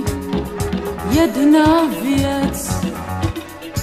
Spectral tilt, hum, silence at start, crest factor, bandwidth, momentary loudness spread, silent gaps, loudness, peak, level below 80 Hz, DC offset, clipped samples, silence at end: -5.5 dB/octave; none; 0 s; 16 dB; 15.5 kHz; 11 LU; none; -18 LUFS; -2 dBFS; -32 dBFS; under 0.1%; under 0.1%; 0 s